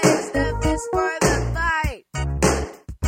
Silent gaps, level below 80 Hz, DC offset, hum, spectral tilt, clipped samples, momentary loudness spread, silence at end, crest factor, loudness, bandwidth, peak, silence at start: none; -30 dBFS; under 0.1%; none; -4.5 dB/octave; under 0.1%; 8 LU; 0 s; 18 dB; -22 LUFS; 16.5 kHz; -4 dBFS; 0 s